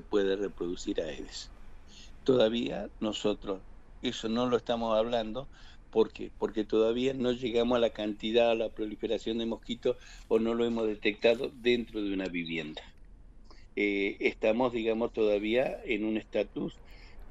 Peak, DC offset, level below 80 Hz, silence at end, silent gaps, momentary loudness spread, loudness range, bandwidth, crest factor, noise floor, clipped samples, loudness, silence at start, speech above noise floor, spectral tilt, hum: -12 dBFS; under 0.1%; -52 dBFS; 0 s; none; 11 LU; 3 LU; 8.2 kHz; 18 dB; -51 dBFS; under 0.1%; -31 LUFS; 0.05 s; 21 dB; -5.5 dB/octave; none